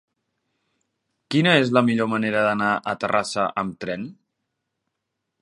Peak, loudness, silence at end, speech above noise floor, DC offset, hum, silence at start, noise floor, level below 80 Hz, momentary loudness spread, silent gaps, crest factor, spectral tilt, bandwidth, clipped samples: -2 dBFS; -21 LUFS; 1.3 s; 59 dB; under 0.1%; none; 1.3 s; -80 dBFS; -64 dBFS; 13 LU; none; 22 dB; -5.5 dB/octave; 11.5 kHz; under 0.1%